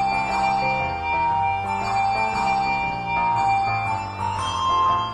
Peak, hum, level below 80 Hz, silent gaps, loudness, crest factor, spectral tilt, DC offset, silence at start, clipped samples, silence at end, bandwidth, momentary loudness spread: -10 dBFS; none; -44 dBFS; none; -22 LUFS; 12 dB; -4.5 dB/octave; under 0.1%; 0 s; under 0.1%; 0 s; 11 kHz; 4 LU